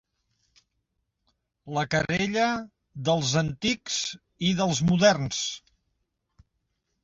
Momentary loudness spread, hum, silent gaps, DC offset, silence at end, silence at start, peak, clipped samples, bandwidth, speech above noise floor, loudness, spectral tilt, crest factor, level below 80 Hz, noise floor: 12 LU; none; none; under 0.1%; 1.45 s; 1.65 s; -6 dBFS; under 0.1%; 7.8 kHz; 53 dB; -26 LUFS; -4.5 dB/octave; 22 dB; -56 dBFS; -78 dBFS